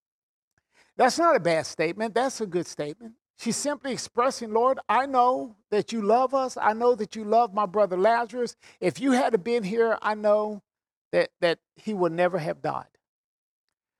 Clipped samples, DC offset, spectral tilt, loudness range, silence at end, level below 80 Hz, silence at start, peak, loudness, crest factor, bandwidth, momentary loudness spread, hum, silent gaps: under 0.1%; under 0.1%; -4.5 dB/octave; 4 LU; 1.15 s; -72 dBFS; 1 s; -6 dBFS; -25 LUFS; 18 dB; 13.5 kHz; 10 LU; none; 3.30-3.34 s, 10.96-11.11 s